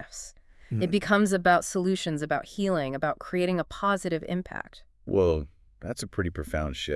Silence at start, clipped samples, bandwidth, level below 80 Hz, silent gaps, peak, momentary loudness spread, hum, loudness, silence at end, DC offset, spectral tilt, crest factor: 0 s; under 0.1%; 12 kHz; -48 dBFS; none; -8 dBFS; 17 LU; none; -27 LUFS; 0 s; under 0.1%; -5.5 dB/octave; 20 dB